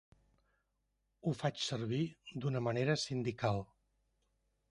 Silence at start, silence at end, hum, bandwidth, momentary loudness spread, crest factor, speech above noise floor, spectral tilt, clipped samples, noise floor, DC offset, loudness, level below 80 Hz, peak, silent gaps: 1.25 s; 1.05 s; none; 11.5 kHz; 7 LU; 20 dB; 46 dB; -5.5 dB/octave; under 0.1%; -82 dBFS; under 0.1%; -37 LUFS; -68 dBFS; -20 dBFS; none